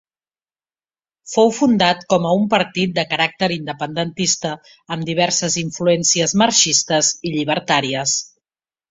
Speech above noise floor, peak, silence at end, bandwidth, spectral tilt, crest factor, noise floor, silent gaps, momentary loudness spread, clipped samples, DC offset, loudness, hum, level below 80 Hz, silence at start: over 72 dB; 0 dBFS; 0.65 s; 8 kHz; -3 dB/octave; 18 dB; under -90 dBFS; none; 9 LU; under 0.1%; under 0.1%; -17 LUFS; none; -58 dBFS; 1.25 s